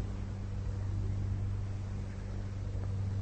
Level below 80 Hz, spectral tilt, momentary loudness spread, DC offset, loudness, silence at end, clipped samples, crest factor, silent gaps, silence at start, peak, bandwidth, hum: -42 dBFS; -8 dB/octave; 5 LU; under 0.1%; -38 LUFS; 0 s; under 0.1%; 12 dB; none; 0 s; -24 dBFS; 8.4 kHz; none